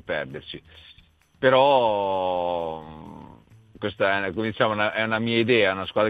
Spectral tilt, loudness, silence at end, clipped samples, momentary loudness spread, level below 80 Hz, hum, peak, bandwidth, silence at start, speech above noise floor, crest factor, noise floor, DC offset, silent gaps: -7.5 dB/octave; -23 LUFS; 0 s; under 0.1%; 20 LU; -58 dBFS; none; -4 dBFS; 5 kHz; 0.1 s; 27 dB; 20 dB; -50 dBFS; under 0.1%; none